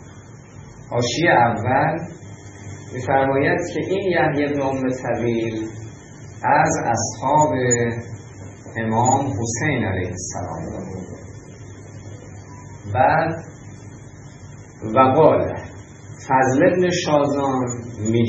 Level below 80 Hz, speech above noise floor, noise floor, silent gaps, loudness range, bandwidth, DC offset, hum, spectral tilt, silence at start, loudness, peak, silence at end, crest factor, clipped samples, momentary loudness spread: -52 dBFS; 22 dB; -41 dBFS; none; 7 LU; 8.2 kHz; under 0.1%; none; -5 dB/octave; 0 s; -19 LUFS; 0 dBFS; 0 s; 20 dB; under 0.1%; 23 LU